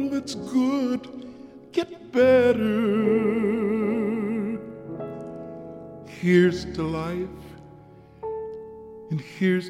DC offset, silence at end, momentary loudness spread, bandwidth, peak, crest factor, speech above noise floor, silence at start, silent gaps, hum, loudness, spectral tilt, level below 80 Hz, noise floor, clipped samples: under 0.1%; 0 s; 21 LU; 13.5 kHz; -8 dBFS; 18 dB; 26 dB; 0 s; none; none; -24 LUFS; -7 dB/octave; -54 dBFS; -48 dBFS; under 0.1%